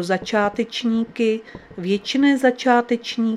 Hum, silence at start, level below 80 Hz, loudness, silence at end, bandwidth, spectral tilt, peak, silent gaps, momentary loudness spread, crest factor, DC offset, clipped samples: none; 0 s; -58 dBFS; -20 LUFS; 0 s; 12.5 kHz; -5 dB/octave; -2 dBFS; none; 8 LU; 18 dB; under 0.1%; under 0.1%